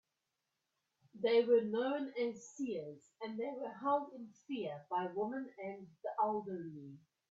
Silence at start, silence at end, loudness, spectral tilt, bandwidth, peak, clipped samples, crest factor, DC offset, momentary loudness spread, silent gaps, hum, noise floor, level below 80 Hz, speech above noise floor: 1.15 s; 0.3 s; -38 LUFS; -5.5 dB/octave; 7.8 kHz; -20 dBFS; under 0.1%; 18 dB; under 0.1%; 17 LU; none; none; -88 dBFS; -86 dBFS; 50 dB